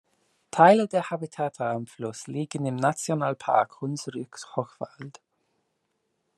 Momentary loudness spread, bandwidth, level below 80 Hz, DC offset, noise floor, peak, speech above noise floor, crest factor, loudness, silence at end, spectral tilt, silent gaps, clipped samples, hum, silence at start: 18 LU; 13 kHz; -76 dBFS; under 0.1%; -76 dBFS; -4 dBFS; 50 dB; 24 dB; -26 LUFS; 1.3 s; -5.5 dB/octave; none; under 0.1%; none; 0.55 s